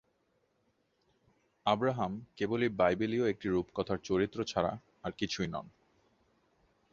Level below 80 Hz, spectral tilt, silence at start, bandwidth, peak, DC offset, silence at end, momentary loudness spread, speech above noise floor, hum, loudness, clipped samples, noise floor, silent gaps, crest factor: -62 dBFS; -6 dB/octave; 1.65 s; 7.6 kHz; -14 dBFS; under 0.1%; 1.25 s; 9 LU; 43 dB; none; -33 LUFS; under 0.1%; -76 dBFS; none; 20 dB